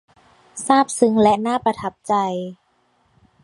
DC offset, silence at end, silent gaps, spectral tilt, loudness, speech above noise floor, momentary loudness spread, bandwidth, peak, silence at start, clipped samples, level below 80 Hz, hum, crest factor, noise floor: under 0.1%; 0.9 s; none; -4.5 dB/octave; -19 LUFS; 44 dB; 15 LU; 11.5 kHz; 0 dBFS; 0.55 s; under 0.1%; -58 dBFS; none; 20 dB; -63 dBFS